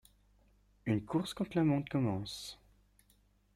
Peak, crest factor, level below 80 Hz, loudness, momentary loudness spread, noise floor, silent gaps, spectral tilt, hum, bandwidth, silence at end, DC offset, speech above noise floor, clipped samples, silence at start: -20 dBFS; 16 dB; -64 dBFS; -35 LUFS; 13 LU; -70 dBFS; none; -6.5 dB/octave; 50 Hz at -55 dBFS; 15.5 kHz; 1 s; under 0.1%; 36 dB; under 0.1%; 0.85 s